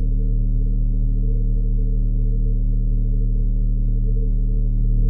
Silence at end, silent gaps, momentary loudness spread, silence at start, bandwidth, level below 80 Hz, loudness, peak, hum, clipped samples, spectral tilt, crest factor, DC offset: 0 s; none; 0 LU; 0 s; 0.6 kHz; -18 dBFS; -23 LUFS; -10 dBFS; none; under 0.1%; -14 dB/octave; 8 dB; under 0.1%